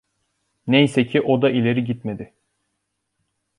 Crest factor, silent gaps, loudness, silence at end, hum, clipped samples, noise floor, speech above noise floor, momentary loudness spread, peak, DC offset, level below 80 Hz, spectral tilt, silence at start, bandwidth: 18 dB; none; -19 LUFS; 1.35 s; none; under 0.1%; -75 dBFS; 57 dB; 18 LU; -4 dBFS; under 0.1%; -60 dBFS; -7 dB/octave; 0.65 s; 11.5 kHz